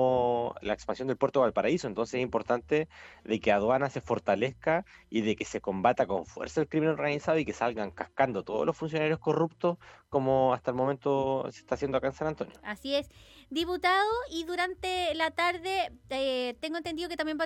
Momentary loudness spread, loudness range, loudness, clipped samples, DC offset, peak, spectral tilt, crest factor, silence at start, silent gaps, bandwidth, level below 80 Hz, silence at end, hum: 8 LU; 2 LU; -30 LUFS; under 0.1%; under 0.1%; -10 dBFS; -5.5 dB/octave; 18 dB; 0 s; none; 15 kHz; -58 dBFS; 0 s; none